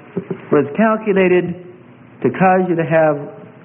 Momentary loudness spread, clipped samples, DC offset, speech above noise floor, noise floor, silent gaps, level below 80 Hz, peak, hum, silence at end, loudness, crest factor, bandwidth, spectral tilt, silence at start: 13 LU; under 0.1%; under 0.1%; 27 dB; -41 dBFS; none; -58 dBFS; -2 dBFS; none; 0.15 s; -15 LUFS; 14 dB; 3.6 kHz; -12.5 dB/octave; 0.15 s